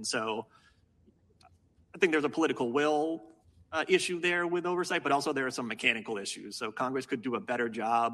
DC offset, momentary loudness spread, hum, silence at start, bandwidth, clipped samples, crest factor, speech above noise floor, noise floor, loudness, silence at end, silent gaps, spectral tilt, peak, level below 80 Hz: under 0.1%; 9 LU; none; 0 s; 13 kHz; under 0.1%; 22 dB; 35 dB; -65 dBFS; -31 LUFS; 0 s; none; -3.5 dB/octave; -10 dBFS; -74 dBFS